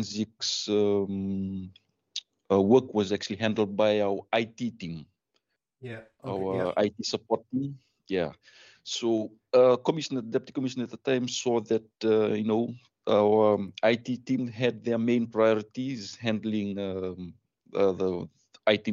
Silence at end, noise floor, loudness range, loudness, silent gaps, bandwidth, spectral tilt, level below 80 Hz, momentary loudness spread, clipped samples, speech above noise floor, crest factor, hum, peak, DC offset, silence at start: 0 s; -78 dBFS; 6 LU; -28 LUFS; none; 7.8 kHz; -5.5 dB/octave; -70 dBFS; 16 LU; under 0.1%; 50 dB; 20 dB; none; -8 dBFS; under 0.1%; 0 s